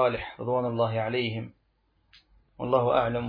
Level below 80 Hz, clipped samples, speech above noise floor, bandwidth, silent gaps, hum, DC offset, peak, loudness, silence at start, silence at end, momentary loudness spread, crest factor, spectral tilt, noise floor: -56 dBFS; under 0.1%; 43 dB; 5.2 kHz; none; none; under 0.1%; -10 dBFS; -28 LUFS; 0 s; 0 s; 14 LU; 18 dB; -9.5 dB/octave; -70 dBFS